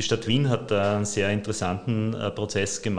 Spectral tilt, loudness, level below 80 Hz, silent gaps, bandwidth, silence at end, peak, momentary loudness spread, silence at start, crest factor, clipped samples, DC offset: -5 dB/octave; -25 LUFS; -54 dBFS; none; 10.5 kHz; 0 s; -8 dBFS; 5 LU; 0 s; 16 dB; under 0.1%; 0.8%